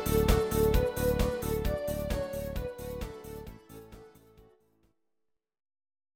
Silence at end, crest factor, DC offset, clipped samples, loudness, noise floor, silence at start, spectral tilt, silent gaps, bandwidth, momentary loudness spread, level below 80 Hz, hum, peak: 2.05 s; 22 dB; under 0.1%; under 0.1%; -31 LUFS; -84 dBFS; 0 s; -6 dB/octave; none; 17 kHz; 22 LU; -38 dBFS; none; -10 dBFS